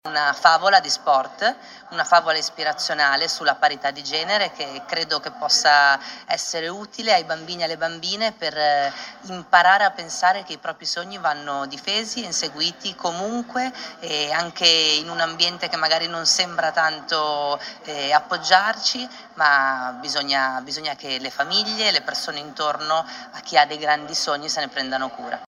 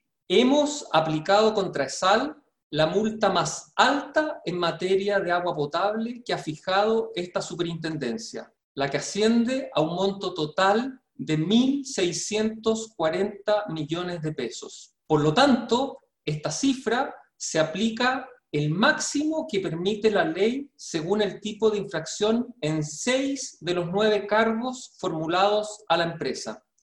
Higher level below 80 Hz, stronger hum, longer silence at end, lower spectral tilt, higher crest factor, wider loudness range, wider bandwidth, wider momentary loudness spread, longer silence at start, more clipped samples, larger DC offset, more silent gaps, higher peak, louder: second, -68 dBFS vs -62 dBFS; neither; second, 0.05 s vs 0.25 s; second, -1 dB/octave vs -4.5 dB/octave; about the same, 22 dB vs 20 dB; about the same, 4 LU vs 3 LU; first, 15 kHz vs 11.5 kHz; about the same, 11 LU vs 10 LU; second, 0.05 s vs 0.3 s; neither; neither; second, none vs 2.63-2.70 s, 8.64-8.75 s; first, 0 dBFS vs -6 dBFS; first, -20 LUFS vs -25 LUFS